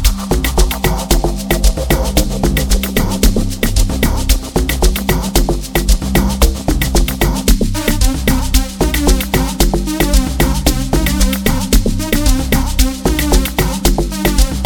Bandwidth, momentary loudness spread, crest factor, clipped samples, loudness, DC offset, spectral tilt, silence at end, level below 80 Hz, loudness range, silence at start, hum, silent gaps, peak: 19.5 kHz; 2 LU; 12 dB; under 0.1%; -15 LUFS; 0.3%; -4.5 dB/octave; 0 s; -14 dBFS; 1 LU; 0 s; none; none; 0 dBFS